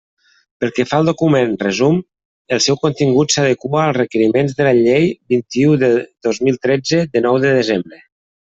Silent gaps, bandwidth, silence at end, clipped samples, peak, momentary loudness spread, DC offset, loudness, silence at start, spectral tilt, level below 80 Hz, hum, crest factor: 2.25-2.45 s; 8 kHz; 0.65 s; under 0.1%; -2 dBFS; 6 LU; under 0.1%; -15 LUFS; 0.6 s; -5 dB/octave; -54 dBFS; none; 14 dB